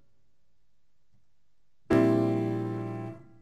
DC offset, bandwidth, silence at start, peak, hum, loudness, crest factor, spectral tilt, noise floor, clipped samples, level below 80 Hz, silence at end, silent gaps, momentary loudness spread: 0.2%; 11.5 kHz; 1.9 s; -12 dBFS; none; -28 LUFS; 20 dB; -8.5 dB/octave; -78 dBFS; under 0.1%; -60 dBFS; 0.2 s; none; 15 LU